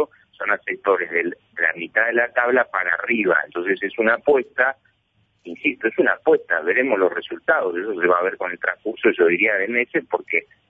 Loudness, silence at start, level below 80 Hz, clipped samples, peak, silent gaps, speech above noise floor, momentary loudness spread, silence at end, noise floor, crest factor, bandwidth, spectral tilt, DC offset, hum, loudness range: -20 LUFS; 0 s; -68 dBFS; under 0.1%; -4 dBFS; none; 45 dB; 7 LU; 0.25 s; -65 dBFS; 16 dB; 3.9 kHz; -7.5 dB/octave; under 0.1%; none; 2 LU